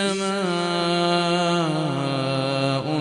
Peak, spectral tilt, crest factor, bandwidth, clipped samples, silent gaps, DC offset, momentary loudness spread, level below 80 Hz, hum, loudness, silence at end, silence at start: -6 dBFS; -5 dB/octave; 16 dB; 11.5 kHz; under 0.1%; none; under 0.1%; 3 LU; -62 dBFS; none; -22 LUFS; 0 s; 0 s